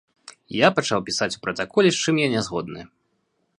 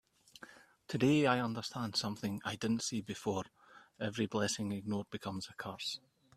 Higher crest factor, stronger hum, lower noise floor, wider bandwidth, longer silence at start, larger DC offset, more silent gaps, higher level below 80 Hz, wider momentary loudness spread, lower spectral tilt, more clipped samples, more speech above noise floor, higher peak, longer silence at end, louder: about the same, 22 dB vs 24 dB; neither; first, -71 dBFS vs -58 dBFS; second, 11.5 kHz vs 14.5 kHz; about the same, 0.5 s vs 0.4 s; neither; neither; first, -60 dBFS vs -72 dBFS; second, 12 LU vs 15 LU; about the same, -4 dB/octave vs -4.5 dB/octave; neither; first, 49 dB vs 22 dB; first, 0 dBFS vs -14 dBFS; first, 0.75 s vs 0.4 s; first, -22 LUFS vs -37 LUFS